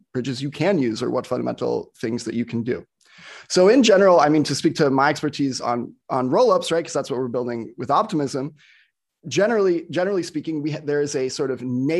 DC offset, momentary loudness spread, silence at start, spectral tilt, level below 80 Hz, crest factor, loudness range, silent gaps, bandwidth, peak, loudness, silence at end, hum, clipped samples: under 0.1%; 12 LU; 0.15 s; -5 dB/octave; -64 dBFS; 18 dB; 6 LU; none; 12.5 kHz; -4 dBFS; -21 LUFS; 0 s; none; under 0.1%